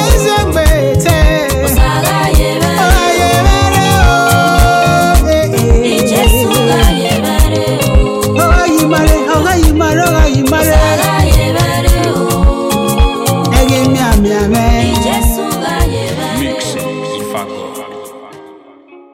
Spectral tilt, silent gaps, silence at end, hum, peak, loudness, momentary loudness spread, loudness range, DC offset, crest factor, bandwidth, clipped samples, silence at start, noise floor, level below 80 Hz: -5 dB/octave; none; 0.2 s; none; 0 dBFS; -10 LUFS; 7 LU; 5 LU; under 0.1%; 10 dB; 17 kHz; under 0.1%; 0 s; -38 dBFS; -14 dBFS